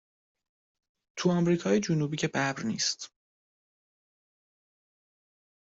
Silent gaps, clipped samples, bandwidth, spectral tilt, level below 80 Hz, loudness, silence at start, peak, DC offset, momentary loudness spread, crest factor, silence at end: none; under 0.1%; 8 kHz; -4.5 dB/octave; -70 dBFS; -29 LUFS; 1.15 s; -14 dBFS; under 0.1%; 11 LU; 20 dB; 2.7 s